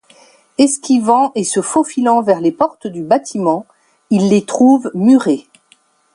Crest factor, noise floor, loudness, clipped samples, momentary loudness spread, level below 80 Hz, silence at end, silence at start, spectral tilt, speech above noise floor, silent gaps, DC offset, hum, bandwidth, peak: 14 dB; -54 dBFS; -14 LUFS; under 0.1%; 7 LU; -62 dBFS; 0.75 s; 0.6 s; -5.5 dB/octave; 41 dB; none; under 0.1%; none; 11 kHz; 0 dBFS